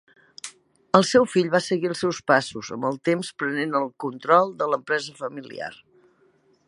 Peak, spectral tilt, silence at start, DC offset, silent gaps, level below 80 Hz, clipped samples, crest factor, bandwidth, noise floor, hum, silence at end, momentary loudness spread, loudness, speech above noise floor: 0 dBFS; -4.5 dB/octave; 0.45 s; under 0.1%; none; -68 dBFS; under 0.1%; 24 dB; 11.5 kHz; -62 dBFS; none; 0.9 s; 16 LU; -23 LUFS; 39 dB